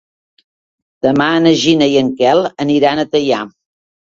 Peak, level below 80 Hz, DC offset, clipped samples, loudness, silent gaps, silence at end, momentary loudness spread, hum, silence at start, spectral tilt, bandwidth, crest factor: 0 dBFS; -54 dBFS; under 0.1%; under 0.1%; -13 LUFS; none; 0.7 s; 7 LU; none; 1.05 s; -5 dB/octave; 7.8 kHz; 14 dB